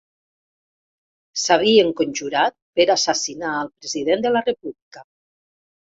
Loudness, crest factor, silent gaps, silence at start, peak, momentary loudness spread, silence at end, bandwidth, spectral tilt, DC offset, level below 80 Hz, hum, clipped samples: -19 LUFS; 20 dB; 2.62-2.73 s, 4.82-4.91 s; 1.35 s; -2 dBFS; 12 LU; 0.9 s; 8 kHz; -2.5 dB/octave; under 0.1%; -62 dBFS; none; under 0.1%